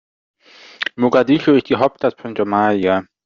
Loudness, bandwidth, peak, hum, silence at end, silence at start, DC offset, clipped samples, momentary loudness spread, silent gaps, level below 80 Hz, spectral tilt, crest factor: -17 LUFS; 7 kHz; -2 dBFS; none; 0.2 s; 0.8 s; under 0.1%; under 0.1%; 9 LU; none; -58 dBFS; -4.5 dB/octave; 14 dB